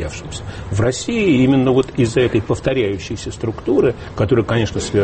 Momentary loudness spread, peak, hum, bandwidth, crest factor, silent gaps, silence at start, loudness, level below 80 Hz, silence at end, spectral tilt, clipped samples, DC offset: 12 LU; -2 dBFS; none; 8.8 kHz; 14 dB; none; 0 s; -17 LUFS; -36 dBFS; 0 s; -6 dB/octave; under 0.1%; under 0.1%